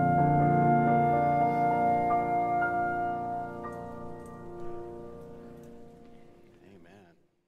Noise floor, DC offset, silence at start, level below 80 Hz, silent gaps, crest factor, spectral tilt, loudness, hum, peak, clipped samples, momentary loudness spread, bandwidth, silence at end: -60 dBFS; under 0.1%; 0 s; -56 dBFS; none; 16 dB; -9.5 dB/octave; -27 LUFS; none; -14 dBFS; under 0.1%; 21 LU; 5.2 kHz; 0.7 s